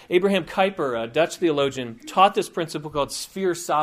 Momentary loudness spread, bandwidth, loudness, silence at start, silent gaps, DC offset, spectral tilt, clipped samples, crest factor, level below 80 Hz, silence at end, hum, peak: 9 LU; 15.5 kHz; -23 LUFS; 0.1 s; none; under 0.1%; -4.5 dB/octave; under 0.1%; 20 dB; -56 dBFS; 0 s; none; -4 dBFS